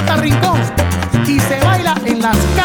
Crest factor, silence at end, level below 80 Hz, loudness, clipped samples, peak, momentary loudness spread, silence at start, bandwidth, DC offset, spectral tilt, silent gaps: 12 dB; 0 s; -26 dBFS; -14 LUFS; under 0.1%; 0 dBFS; 3 LU; 0 s; over 20 kHz; under 0.1%; -5.5 dB/octave; none